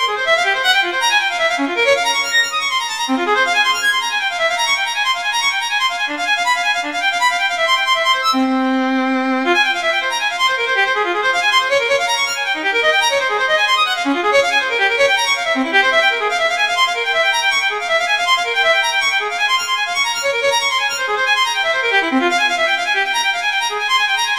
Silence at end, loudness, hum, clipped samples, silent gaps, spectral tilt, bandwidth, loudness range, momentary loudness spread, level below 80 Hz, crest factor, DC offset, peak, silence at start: 0 s; -15 LUFS; none; under 0.1%; none; 0 dB/octave; 16.5 kHz; 1 LU; 3 LU; -58 dBFS; 14 dB; 0.2%; -2 dBFS; 0 s